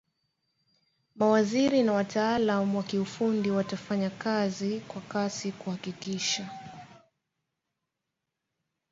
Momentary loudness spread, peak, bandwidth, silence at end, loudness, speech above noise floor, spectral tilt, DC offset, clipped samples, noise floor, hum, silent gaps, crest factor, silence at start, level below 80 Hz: 12 LU; -12 dBFS; 7.8 kHz; 2 s; -29 LUFS; 57 dB; -5 dB/octave; under 0.1%; under 0.1%; -85 dBFS; none; none; 18 dB; 1.15 s; -68 dBFS